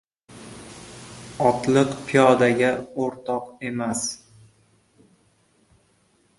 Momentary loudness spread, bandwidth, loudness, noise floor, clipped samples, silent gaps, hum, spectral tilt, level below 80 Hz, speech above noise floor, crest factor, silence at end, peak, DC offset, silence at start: 23 LU; 11.5 kHz; -22 LUFS; -63 dBFS; under 0.1%; none; none; -5 dB/octave; -60 dBFS; 42 dB; 22 dB; 2.25 s; -2 dBFS; under 0.1%; 0.3 s